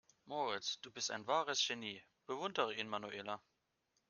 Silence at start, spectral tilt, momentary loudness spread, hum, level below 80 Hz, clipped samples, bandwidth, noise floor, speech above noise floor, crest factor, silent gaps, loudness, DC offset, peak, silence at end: 0.25 s; -1.5 dB/octave; 11 LU; none; -86 dBFS; under 0.1%; 10.5 kHz; -83 dBFS; 42 dB; 22 dB; none; -41 LUFS; under 0.1%; -20 dBFS; 0.7 s